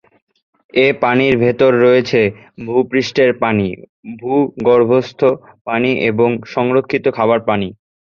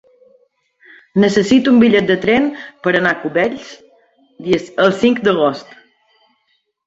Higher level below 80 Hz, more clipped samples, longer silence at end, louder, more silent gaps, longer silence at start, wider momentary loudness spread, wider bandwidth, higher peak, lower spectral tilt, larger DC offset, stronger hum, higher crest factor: about the same, -50 dBFS vs -54 dBFS; neither; second, 0.35 s vs 1.25 s; about the same, -15 LUFS vs -14 LUFS; first, 3.89-4.03 s, 5.61-5.65 s vs none; second, 0.75 s vs 1.15 s; about the same, 9 LU vs 11 LU; second, 7 kHz vs 8 kHz; about the same, 0 dBFS vs 0 dBFS; about the same, -7 dB/octave vs -6 dB/octave; neither; neither; about the same, 14 dB vs 16 dB